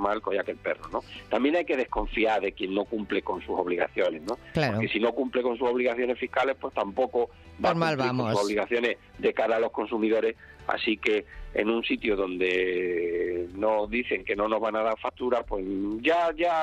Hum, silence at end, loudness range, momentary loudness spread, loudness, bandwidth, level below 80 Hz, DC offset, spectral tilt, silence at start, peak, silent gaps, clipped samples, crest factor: none; 0 s; 1 LU; 6 LU; -27 LUFS; 12 kHz; -50 dBFS; under 0.1%; -6 dB/octave; 0 s; -10 dBFS; none; under 0.1%; 18 dB